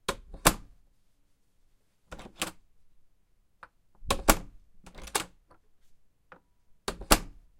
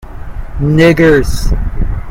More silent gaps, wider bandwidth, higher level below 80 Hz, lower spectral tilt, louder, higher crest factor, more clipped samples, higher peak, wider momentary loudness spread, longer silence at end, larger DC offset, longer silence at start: neither; about the same, 16.5 kHz vs 16.5 kHz; second, -42 dBFS vs -18 dBFS; second, -2.5 dB/octave vs -6.5 dB/octave; second, -29 LUFS vs -11 LUFS; first, 34 dB vs 10 dB; second, under 0.1% vs 0.1%; about the same, 0 dBFS vs 0 dBFS; about the same, 22 LU vs 20 LU; first, 0.3 s vs 0 s; neither; about the same, 0.1 s vs 0.05 s